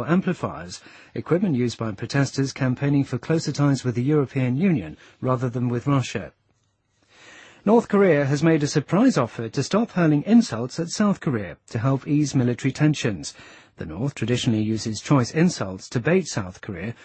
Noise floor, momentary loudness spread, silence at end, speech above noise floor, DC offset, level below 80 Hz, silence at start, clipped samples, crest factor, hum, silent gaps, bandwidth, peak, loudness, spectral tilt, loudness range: -68 dBFS; 13 LU; 0.1 s; 46 dB; under 0.1%; -56 dBFS; 0 s; under 0.1%; 16 dB; none; none; 8.8 kHz; -6 dBFS; -23 LUFS; -6.5 dB/octave; 4 LU